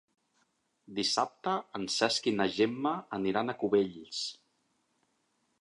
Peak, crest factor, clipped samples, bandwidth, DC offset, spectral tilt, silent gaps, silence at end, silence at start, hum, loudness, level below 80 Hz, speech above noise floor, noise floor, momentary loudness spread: -12 dBFS; 22 dB; under 0.1%; 11.5 kHz; under 0.1%; -3.5 dB/octave; none; 1.25 s; 0.9 s; none; -31 LUFS; -72 dBFS; 45 dB; -76 dBFS; 8 LU